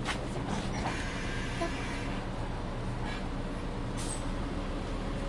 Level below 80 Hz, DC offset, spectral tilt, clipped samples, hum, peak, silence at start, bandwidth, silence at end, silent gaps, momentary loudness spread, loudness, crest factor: -38 dBFS; under 0.1%; -5 dB/octave; under 0.1%; none; -18 dBFS; 0 s; 11.5 kHz; 0 s; none; 3 LU; -36 LUFS; 16 dB